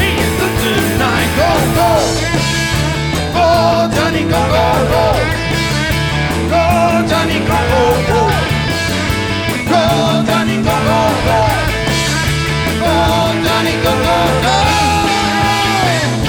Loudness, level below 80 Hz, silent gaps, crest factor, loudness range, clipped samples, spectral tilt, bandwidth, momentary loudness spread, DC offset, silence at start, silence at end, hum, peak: -13 LUFS; -26 dBFS; none; 12 dB; 1 LU; under 0.1%; -4.5 dB/octave; over 20 kHz; 4 LU; under 0.1%; 0 s; 0 s; none; 0 dBFS